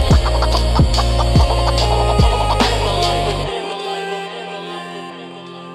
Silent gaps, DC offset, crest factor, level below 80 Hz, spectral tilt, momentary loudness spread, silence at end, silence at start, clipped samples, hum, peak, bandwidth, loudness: none; under 0.1%; 14 dB; -20 dBFS; -5.5 dB/octave; 14 LU; 0 s; 0 s; under 0.1%; none; -2 dBFS; 13 kHz; -17 LUFS